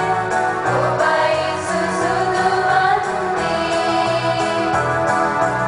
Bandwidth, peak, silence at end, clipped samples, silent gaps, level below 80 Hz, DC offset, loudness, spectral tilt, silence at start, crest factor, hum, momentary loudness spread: 10.5 kHz; -4 dBFS; 0 s; under 0.1%; none; -48 dBFS; under 0.1%; -18 LUFS; -4.5 dB/octave; 0 s; 14 dB; none; 4 LU